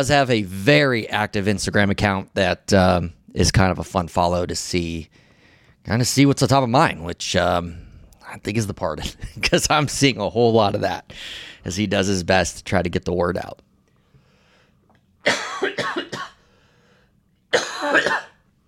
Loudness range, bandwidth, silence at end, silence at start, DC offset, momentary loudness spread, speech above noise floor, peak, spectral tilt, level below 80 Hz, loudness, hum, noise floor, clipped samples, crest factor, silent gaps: 7 LU; 16.5 kHz; 0.4 s; 0 s; under 0.1%; 13 LU; 41 dB; -4 dBFS; -4.5 dB/octave; -42 dBFS; -20 LUFS; none; -61 dBFS; under 0.1%; 18 dB; none